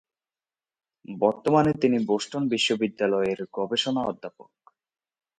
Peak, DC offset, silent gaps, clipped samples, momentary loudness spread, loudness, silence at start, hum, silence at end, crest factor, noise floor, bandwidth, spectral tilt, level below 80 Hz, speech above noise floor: -6 dBFS; under 0.1%; none; under 0.1%; 10 LU; -25 LUFS; 1.1 s; none; 0.95 s; 20 dB; under -90 dBFS; 11 kHz; -5 dB/octave; -64 dBFS; over 65 dB